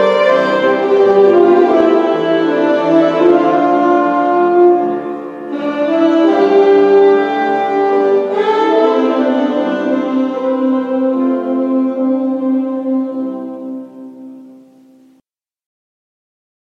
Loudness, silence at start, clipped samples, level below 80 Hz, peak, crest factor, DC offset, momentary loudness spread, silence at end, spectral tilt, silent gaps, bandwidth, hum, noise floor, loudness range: -12 LUFS; 0 s; under 0.1%; -64 dBFS; 0 dBFS; 12 dB; under 0.1%; 12 LU; 2.15 s; -6.5 dB/octave; none; 7.2 kHz; none; -60 dBFS; 9 LU